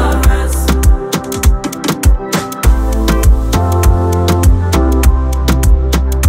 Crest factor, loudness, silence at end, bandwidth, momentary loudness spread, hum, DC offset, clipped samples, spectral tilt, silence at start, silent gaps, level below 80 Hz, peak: 10 dB; -13 LUFS; 0 s; 16.5 kHz; 3 LU; none; under 0.1%; under 0.1%; -5.5 dB/octave; 0 s; none; -12 dBFS; 0 dBFS